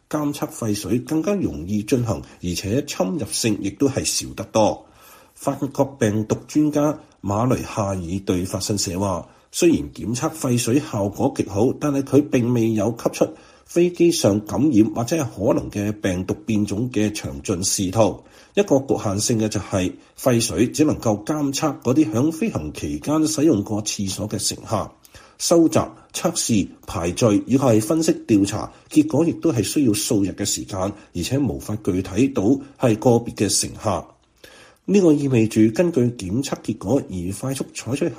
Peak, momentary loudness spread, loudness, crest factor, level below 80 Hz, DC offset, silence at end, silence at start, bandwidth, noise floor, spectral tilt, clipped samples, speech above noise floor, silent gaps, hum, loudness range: -2 dBFS; 9 LU; -21 LUFS; 18 dB; -48 dBFS; under 0.1%; 0 s; 0.1 s; 15.5 kHz; -48 dBFS; -5 dB/octave; under 0.1%; 28 dB; none; none; 3 LU